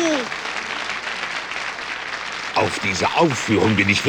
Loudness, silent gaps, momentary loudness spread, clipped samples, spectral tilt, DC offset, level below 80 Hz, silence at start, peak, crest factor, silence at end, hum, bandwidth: -21 LUFS; none; 9 LU; under 0.1%; -4 dB/octave; under 0.1%; -54 dBFS; 0 s; -4 dBFS; 18 dB; 0 s; none; over 20 kHz